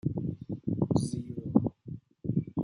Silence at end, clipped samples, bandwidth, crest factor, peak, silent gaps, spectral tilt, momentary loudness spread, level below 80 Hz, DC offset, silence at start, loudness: 0 s; under 0.1%; 11 kHz; 22 dB; -10 dBFS; none; -9 dB/octave; 10 LU; -58 dBFS; under 0.1%; 0.05 s; -32 LUFS